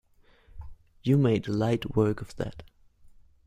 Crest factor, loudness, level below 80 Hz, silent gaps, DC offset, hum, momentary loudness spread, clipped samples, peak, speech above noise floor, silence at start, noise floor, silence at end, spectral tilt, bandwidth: 18 dB; -27 LUFS; -52 dBFS; none; under 0.1%; none; 26 LU; under 0.1%; -10 dBFS; 32 dB; 0.55 s; -58 dBFS; 0.85 s; -8 dB/octave; 14 kHz